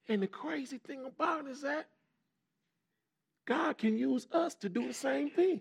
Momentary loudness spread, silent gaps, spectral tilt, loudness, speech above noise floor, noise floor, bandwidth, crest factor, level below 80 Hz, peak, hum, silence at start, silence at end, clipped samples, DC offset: 9 LU; none; -5.5 dB/octave; -35 LUFS; 53 dB; -87 dBFS; 14.5 kHz; 16 dB; under -90 dBFS; -18 dBFS; none; 0.1 s; 0 s; under 0.1%; under 0.1%